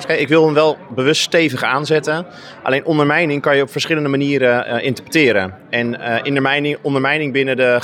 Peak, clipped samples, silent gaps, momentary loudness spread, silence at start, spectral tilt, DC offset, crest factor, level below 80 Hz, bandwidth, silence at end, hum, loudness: -2 dBFS; under 0.1%; none; 6 LU; 0 s; -5 dB/octave; under 0.1%; 14 dB; -66 dBFS; 16 kHz; 0 s; none; -16 LUFS